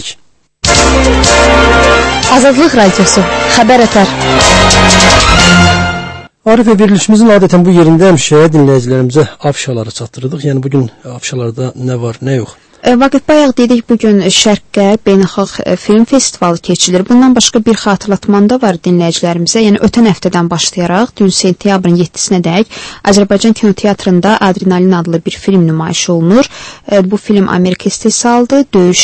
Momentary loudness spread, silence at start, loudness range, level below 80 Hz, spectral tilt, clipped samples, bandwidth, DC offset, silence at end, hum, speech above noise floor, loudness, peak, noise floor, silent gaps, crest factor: 10 LU; 0 s; 5 LU; -24 dBFS; -4.5 dB/octave; 2%; 11 kHz; under 0.1%; 0 s; none; 37 dB; -8 LUFS; 0 dBFS; -45 dBFS; none; 8 dB